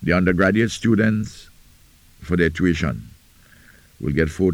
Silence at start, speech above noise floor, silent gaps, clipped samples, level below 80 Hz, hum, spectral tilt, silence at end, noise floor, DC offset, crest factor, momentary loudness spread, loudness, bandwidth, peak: 0 s; 32 dB; none; under 0.1%; -38 dBFS; none; -6.5 dB/octave; 0 s; -51 dBFS; under 0.1%; 16 dB; 10 LU; -20 LUFS; 16.5 kHz; -6 dBFS